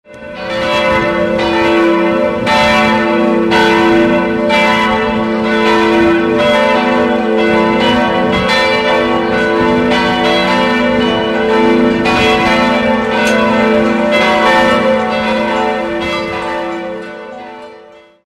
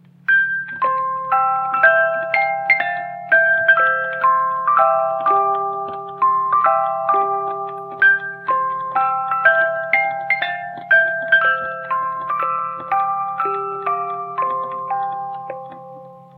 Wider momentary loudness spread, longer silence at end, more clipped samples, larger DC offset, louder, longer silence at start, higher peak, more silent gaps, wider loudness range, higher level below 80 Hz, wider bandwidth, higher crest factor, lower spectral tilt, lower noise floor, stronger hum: about the same, 8 LU vs 10 LU; first, 0.45 s vs 0.15 s; neither; first, 0.1% vs under 0.1%; first, -11 LUFS vs -17 LUFS; second, 0.1 s vs 0.3 s; about the same, 0 dBFS vs 0 dBFS; neither; second, 2 LU vs 6 LU; first, -38 dBFS vs -74 dBFS; second, 13.5 kHz vs 15 kHz; second, 10 dB vs 18 dB; about the same, -5 dB/octave vs -6 dB/octave; about the same, -38 dBFS vs -39 dBFS; neither